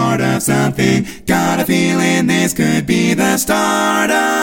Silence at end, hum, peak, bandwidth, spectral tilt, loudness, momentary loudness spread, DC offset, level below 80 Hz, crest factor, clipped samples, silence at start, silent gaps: 0 s; none; 0 dBFS; 17 kHz; -4.5 dB/octave; -14 LUFS; 2 LU; under 0.1%; -42 dBFS; 14 dB; under 0.1%; 0 s; none